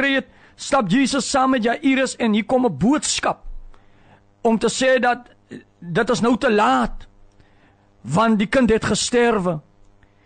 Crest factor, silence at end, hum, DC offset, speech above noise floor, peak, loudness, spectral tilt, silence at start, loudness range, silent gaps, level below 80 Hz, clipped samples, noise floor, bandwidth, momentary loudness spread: 12 dB; 0.65 s; none; under 0.1%; 36 dB; -8 dBFS; -19 LUFS; -4.5 dB/octave; 0 s; 3 LU; none; -42 dBFS; under 0.1%; -54 dBFS; 9.4 kHz; 8 LU